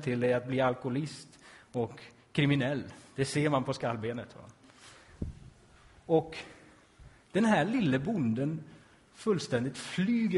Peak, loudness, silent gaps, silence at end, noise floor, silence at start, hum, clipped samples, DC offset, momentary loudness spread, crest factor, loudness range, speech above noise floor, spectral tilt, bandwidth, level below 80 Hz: -14 dBFS; -31 LUFS; none; 0 s; -58 dBFS; 0 s; none; under 0.1%; under 0.1%; 15 LU; 18 dB; 5 LU; 28 dB; -6.5 dB/octave; 11.5 kHz; -58 dBFS